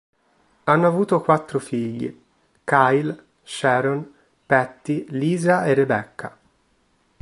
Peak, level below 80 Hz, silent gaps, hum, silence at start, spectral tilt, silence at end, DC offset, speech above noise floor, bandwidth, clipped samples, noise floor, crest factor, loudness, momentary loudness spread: -2 dBFS; -64 dBFS; none; none; 0.65 s; -6.5 dB/octave; 0.9 s; under 0.1%; 44 dB; 11.5 kHz; under 0.1%; -64 dBFS; 20 dB; -21 LUFS; 17 LU